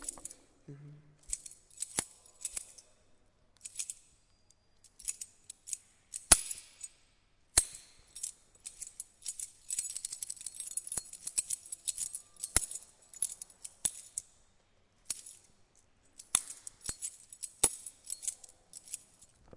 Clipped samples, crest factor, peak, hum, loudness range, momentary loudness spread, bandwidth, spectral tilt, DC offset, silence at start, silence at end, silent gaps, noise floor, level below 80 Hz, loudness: under 0.1%; 38 dB; -2 dBFS; none; 11 LU; 21 LU; 11.5 kHz; 0 dB/octave; under 0.1%; 0 s; 0 s; none; -69 dBFS; -58 dBFS; -35 LUFS